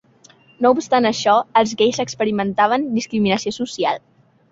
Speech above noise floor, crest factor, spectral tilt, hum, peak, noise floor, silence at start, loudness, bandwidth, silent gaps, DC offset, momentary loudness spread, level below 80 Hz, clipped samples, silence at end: 33 dB; 18 dB; -4.5 dB/octave; none; -2 dBFS; -51 dBFS; 0.6 s; -18 LUFS; 7.8 kHz; none; under 0.1%; 6 LU; -58 dBFS; under 0.1%; 0.55 s